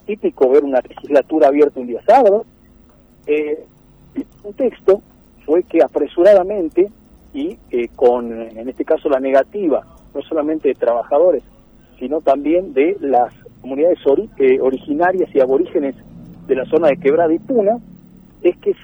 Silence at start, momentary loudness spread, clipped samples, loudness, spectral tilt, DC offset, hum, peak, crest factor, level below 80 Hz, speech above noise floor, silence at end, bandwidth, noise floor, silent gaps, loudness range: 0.1 s; 14 LU; under 0.1%; -16 LUFS; -7.5 dB/octave; under 0.1%; none; -2 dBFS; 14 dB; -50 dBFS; 32 dB; 0.1 s; over 20 kHz; -48 dBFS; none; 3 LU